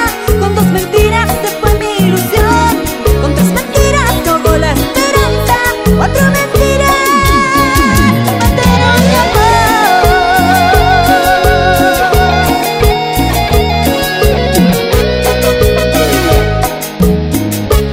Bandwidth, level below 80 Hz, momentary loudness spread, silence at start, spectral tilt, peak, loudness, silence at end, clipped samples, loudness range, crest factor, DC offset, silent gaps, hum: 16.5 kHz; -18 dBFS; 4 LU; 0 s; -5 dB/octave; 0 dBFS; -9 LUFS; 0 s; 0.2%; 3 LU; 8 dB; under 0.1%; none; none